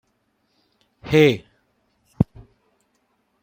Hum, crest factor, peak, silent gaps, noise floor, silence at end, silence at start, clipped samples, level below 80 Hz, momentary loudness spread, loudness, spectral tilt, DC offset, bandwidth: none; 22 dB; -2 dBFS; none; -69 dBFS; 1.2 s; 1.05 s; under 0.1%; -48 dBFS; 15 LU; -20 LUFS; -7 dB/octave; under 0.1%; 16 kHz